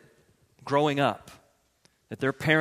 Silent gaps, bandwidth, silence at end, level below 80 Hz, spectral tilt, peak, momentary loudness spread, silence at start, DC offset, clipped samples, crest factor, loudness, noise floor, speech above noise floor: none; 15.5 kHz; 0 s; -64 dBFS; -6 dB/octave; -8 dBFS; 20 LU; 0.65 s; under 0.1%; under 0.1%; 22 dB; -27 LUFS; -67 dBFS; 41 dB